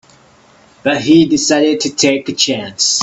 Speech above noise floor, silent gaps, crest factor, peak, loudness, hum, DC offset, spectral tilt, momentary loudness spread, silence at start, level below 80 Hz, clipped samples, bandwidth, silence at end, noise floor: 34 dB; none; 14 dB; 0 dBFS; -13 LUFS; none; under 0.1%; -3 dB/octave; 6 LU; 0.85 s; -52 dBFS; under 0.1%; 8.4 kHz; 0 s; -46 dBFS